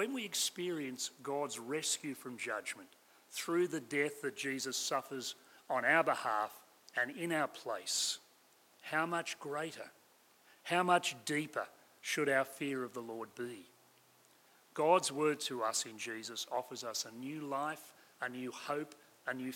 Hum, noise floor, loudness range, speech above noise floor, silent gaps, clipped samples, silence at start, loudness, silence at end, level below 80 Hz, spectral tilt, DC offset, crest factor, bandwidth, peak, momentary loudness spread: none; -67 dBFS; 4 LU; 30 dB; none; under 0.1%; 0 s; -37 LUFS; 0 s; under -90 dBFS; -2.5 dB/octave; under 0.1%; 22 dB; 16.5 kHz; -16 dBFS; 15 LU